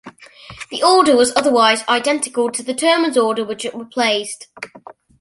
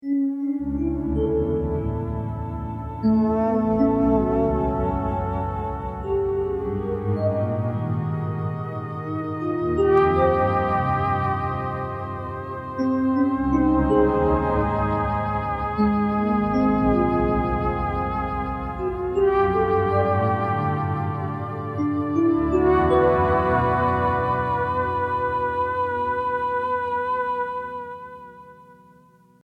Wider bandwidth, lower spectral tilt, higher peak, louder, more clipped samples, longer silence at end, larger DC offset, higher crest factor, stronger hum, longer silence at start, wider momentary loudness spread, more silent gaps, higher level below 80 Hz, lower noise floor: first, 11.5 kHz vs 6 kHz; second, -2 dB/octave vs -9.5 dB/octave; first, 0 dBFS vs -4 dBFS; first, -16 LUFS vs -23 LUFS; neither; second, 0.4 s vs 0.7 s; neither; about the same, 16 dB vs 18 dB; neither; about the same, 0.05 s vs 0.05 s; first, 17 LU vs 10 LU; neither; second, -60 dBFS vs -36 dBFS; second, -40 dBFS vs -54 dBFS